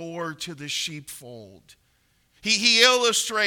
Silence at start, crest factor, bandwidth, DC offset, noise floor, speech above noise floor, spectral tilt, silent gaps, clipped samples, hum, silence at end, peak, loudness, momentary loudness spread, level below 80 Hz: 0 s; 22 dB; 19 kHz; under 0.1%; -66 dBFS; 42 dB; -1 dB/octave; none; under 0.1%; none; 0 s; -2 dBFS; -20 LUFS; 22 LU; -68 dBFS